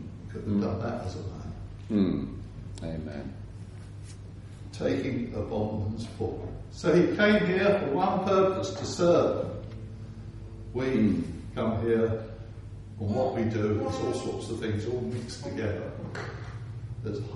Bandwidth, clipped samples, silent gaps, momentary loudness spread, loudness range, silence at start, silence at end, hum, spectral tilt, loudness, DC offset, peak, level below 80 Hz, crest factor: 11.5 kHz; under 0.1%; none; 19 LU; 9 LU; 0 s; 0 s; none; -7 dB/octave; -29 LUFS; under 0.1%; -10 dBFS; -48 dBFS; 20 dB